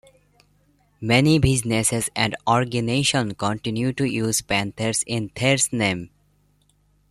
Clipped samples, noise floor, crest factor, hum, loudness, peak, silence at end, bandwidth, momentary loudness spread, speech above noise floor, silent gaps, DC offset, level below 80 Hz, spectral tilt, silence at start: under 0.1%; -62 dBFS; 20 dB; 50 Hz at -45 dBFS; -21 LUFS; -2 dBFS; 1.05 s; 13.5 kHz; 7 LU; 41 dB; none; under 0.1%; -44 dBFS; -4 dB/octave; 1 s